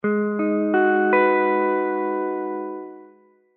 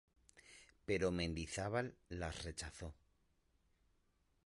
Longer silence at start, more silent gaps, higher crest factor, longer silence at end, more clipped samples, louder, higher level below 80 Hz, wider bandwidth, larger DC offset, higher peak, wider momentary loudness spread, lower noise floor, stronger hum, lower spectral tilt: second, 0.05 s vs 0.35 s; neither; second, 14 dB vs 20 dB; second, 0.5 s vs 1.5 s; neither; first, -21 LUFS vs -43 LUFS; second, -78 dBFS vs -58 dBFS; second, 4.2 kHz vs 11.5 kHz; neither; first, -6 dBFS vs -26 dBFS; second, 13 LU vs 18 LU; second, -54 dBFS vs -79 dBFS; neither; about the same, -5.5 dB/octave vs -5 dB/octave